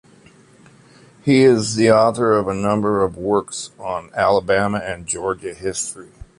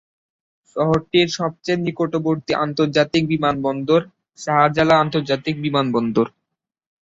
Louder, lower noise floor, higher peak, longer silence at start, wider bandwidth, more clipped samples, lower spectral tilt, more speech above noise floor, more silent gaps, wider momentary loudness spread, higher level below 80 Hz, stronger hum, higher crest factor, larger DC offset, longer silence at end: about the same, -18 LUFS vs -19 LUFS; second, -49 dBFS vs -80 dBFS; about the same, -2 dBFS vs -2 dBFS; first, 1.25 s vs 0.75 s; first, 11.5 kHz vs 7.8 kHz; neither; about the same, -5 dB/octave vs -6 dB/octave; second, 31 dB vs 62 dB; neither; first, 13 LU vs 7 LU; first, -48 dBFS vs -54 dBFS; neither; about the same, 16 dB vs 18 dB; neither; second, 0.35 s vs 0.75 s